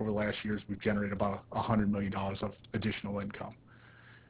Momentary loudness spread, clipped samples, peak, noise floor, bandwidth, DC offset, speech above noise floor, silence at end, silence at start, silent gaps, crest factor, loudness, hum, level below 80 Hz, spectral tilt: 9 LU; under 0.1%; -18 dBFS; -57 dBFS; 4 kHz; under 0.1%; 23 dB; 0.1 s; 0 s; none; 18 dB; -35 LUFS; none; -54 dBFS; -5.5 dB/octave